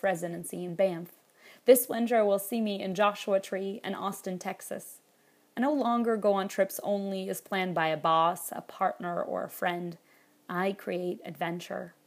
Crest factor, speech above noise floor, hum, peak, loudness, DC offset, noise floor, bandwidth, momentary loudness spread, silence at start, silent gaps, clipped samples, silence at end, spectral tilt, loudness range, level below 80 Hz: 22 dB; 36 dB; none; -8 dBFS; -30 LUFS; under 0.1%; -65 dBFS; 15.5 kHz; 12 LU; 0.05 s; none; under 0.1%; 0.15 s; -4.5 dB/octave; 5 LU; -84 dBFS